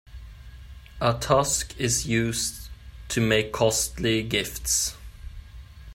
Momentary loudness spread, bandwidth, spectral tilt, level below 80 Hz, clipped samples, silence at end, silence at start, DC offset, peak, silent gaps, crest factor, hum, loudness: 23 LU; 16.5 kHz; -3.5 dB/octave; -42 dBFS; under 0.1%; 0 s; 0.1 s; under 0.1%; -6 dBFS; none; 20 dB; none; -24 LUFS